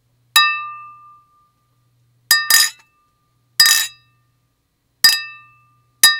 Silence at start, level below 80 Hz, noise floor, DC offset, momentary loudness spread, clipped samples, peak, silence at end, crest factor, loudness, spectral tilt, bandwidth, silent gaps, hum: 0.35 s; -70 dBFS; -67 dBFS; under 0.1%; 15 LU; under 0.1%; 0 dBFS; 0 s; 20 dB; -13 LUFS; 4 dB/octave; over 20 kHz; none; none